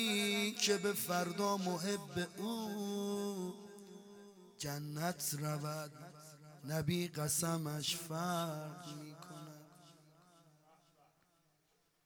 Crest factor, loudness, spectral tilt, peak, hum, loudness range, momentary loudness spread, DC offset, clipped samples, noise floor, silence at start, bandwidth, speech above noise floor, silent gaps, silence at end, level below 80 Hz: 22 dB; -38 LUFS; -4 dB/octave; -20 dBFS; none; 8 LU; 21 LU; under 0.1%; under 0.1%; -77 dBFS; 0 s; over 20 kHz; 38 dB; none; 2.15 s; -76 dBFS